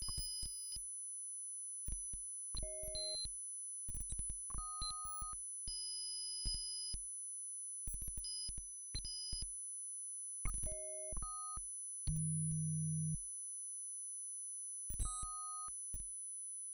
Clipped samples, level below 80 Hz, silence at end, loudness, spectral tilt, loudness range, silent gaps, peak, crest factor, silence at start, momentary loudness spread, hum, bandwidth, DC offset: under 0.1%; -52 dBFS; 0 s; -42 LUFS; -3 dB/octave; 2 LU; none; -26 dBFS; 18 dB; 0 s; 4 LU; none; over 20 kHz; under 0.1%